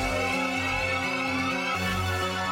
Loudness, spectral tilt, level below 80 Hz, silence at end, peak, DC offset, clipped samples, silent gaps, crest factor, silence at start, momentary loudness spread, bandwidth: -26 LUFS; -4 dB/octave; -46 dBFS; 0 s; -14 dBFS; under 0.1%; under 0.1%; none; 14 dB; 0 s; 1 LU; 16.5 kHz